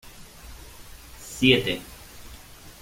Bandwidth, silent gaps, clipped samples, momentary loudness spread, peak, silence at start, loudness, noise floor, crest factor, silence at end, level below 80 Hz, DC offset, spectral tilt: 16.5 kHz; none; under 0.1%; 26 LU; -2 dBFS; 0.05 s; -22 LUFS; -45 dBFS; 26 dB; 0.1 s; -48 dBFS; under 0.1%; -4.5 dB/octave